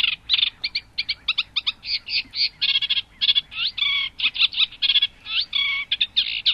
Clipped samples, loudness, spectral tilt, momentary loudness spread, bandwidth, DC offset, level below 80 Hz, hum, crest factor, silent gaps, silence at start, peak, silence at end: under 0.1%; -20 LUFS; -0.5 dB/octave; 6 LU; 12 kHz; under 0.1%; -56 dBFS; none; 20 dB; none; 0 s; -4 dBFS; 0 s